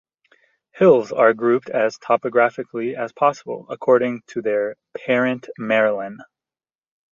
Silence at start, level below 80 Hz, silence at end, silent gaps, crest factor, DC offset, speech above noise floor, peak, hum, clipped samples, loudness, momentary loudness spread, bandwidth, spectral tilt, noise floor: 0.75 s; -68 dBFS; 0.9 s; none; 18 dB; under 0.1%; over 71 dB; -2 dBFS; none; under 0.1%; -19 LUFS; 13 LU; 7.2 kHz; -6.5 dB/octave; under -90 dBFS